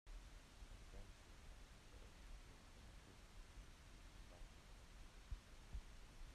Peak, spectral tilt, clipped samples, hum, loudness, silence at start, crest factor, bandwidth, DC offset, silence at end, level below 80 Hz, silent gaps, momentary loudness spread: -40 dBFS; -4 dB/octave; under 0.1%; none; -63 LUFS; 0.05 s; 20 dB; 13.5 kHz; under 0.1%; 0 s; -60 dBFS; none; 5 LU